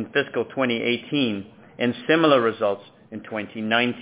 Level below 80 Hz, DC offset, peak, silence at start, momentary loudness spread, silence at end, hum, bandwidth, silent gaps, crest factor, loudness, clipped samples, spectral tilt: -66 dBFS; under 0.1%; -4 dBFS; 0 s; 15 LU; 0 s; none; 4 kHz; none; 18 dB; -23 LUFS; under 0.1%; -9 dB/octave